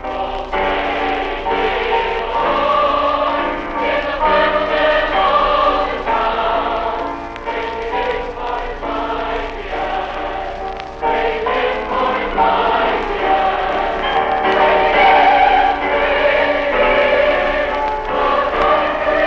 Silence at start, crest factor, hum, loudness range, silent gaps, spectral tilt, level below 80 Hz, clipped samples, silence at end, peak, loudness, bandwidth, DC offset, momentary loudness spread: 0 s; 14 dB; 60 Hz at -40 dBFS; 8 LU; none; -5 dB/octave; -34 dBFS; under 0.1%; 0 s; -2 dBFS; -16 LUFS; 7.4 kHz; under 0.1%; 10 LU